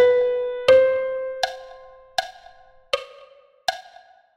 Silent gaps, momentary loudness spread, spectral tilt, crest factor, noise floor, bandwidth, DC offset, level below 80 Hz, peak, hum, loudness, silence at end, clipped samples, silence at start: none; 23 LU; -2 dB/octave; 18 dB; -51 dBFS; 11.5 kHz; under 0.1%; -58 dBFS; -4 dBFS; none; -22 LUFS; 0.55 s; under 0.1%; 0 s